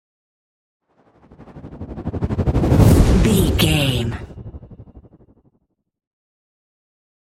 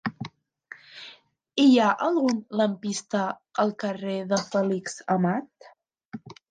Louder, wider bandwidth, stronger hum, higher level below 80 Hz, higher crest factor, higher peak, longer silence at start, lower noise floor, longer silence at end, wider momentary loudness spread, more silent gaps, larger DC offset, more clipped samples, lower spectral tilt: first, -16 LUFS vs -25 LUFS; first, 16.5 kHz vs 9.6 kHz; neither; first, -26 dBFS vs -72 dBFS; about the same, 18 dB vs 18 dB; first, -2 dBFS vs -10 dBFS; first, 1.4 s vs 0.05 s; first, -67 dBFS vs -52 dBFS; first, 2.4 s vs 0.2 s; about the same, 24 LU vs 23 LU; second, none vs 6.05-6.10 s; neither; neither; about the same, -6 dB/octave vs -5.5 dB/octave